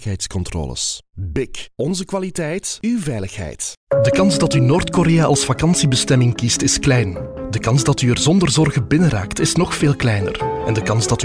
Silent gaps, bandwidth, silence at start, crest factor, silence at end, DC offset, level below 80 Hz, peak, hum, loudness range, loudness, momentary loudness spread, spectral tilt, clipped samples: 3.77-3.87 s; 10.5 kHz; 0 s; 12 dB; 0 s; under 0.1%; -36 dBFS; -6 dBFS; none; 8 LU; -17 LUFS; 10 LU; -5 dB/octave; under 0.1%